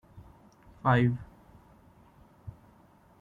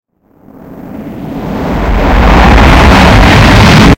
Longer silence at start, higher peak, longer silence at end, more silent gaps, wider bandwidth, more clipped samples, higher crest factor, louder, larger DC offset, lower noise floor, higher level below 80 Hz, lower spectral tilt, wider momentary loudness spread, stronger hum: second, 0.15 s vs 0.7 s; second, -12 dBFS vs 0 dBFS; first, 0.7 s vs 0 s; neither; second, 4.5 kHz vs 16.5 kHz; second, under 0.1% vs 8%; first, 22 dB vs 6 dB; second, -28 LUFS vs -5 LUFS; neither; first, -60 dBFS vs -41 dBFS; second, -58 dBFS vs -10 dBFS; first, -9 dB/octave vs -6 dB/octave; first, 25 LU vs 19 LU; neither